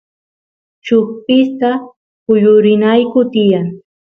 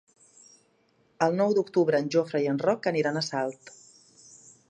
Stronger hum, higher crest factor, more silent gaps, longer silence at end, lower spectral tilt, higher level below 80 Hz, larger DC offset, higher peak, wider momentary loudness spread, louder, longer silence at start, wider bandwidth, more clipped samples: neither; second, 12 dB vs 20 dB; first, 1.96-2.26 s vs none; second, 0.3 s vs 1 s; first, -8.5 dB/octave vs -5.5 dB/octave; first, -60 dBFS vs -76 dBFS; neither; first, 0 dBFS vs -8 dBFS; first, 13 LU vs 7 LU; first, -12 LUFS vs -26 LUFS; second, 0.85 s vs 1.2 s; second, 6.2 kHz vs 10 kHz; neither